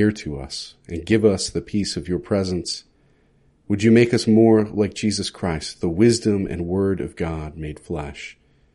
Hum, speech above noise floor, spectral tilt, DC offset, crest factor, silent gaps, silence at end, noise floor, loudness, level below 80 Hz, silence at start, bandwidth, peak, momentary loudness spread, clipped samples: none; 38 dB; -5.5 dB/octave; under 0.1%; 18 dB; none; 0.4 s; -59 dBFS; -21 LUFS; -44 dBFS; 0 s; 11.5 kHz; -2 dBFS; 16 LU; under 0.1%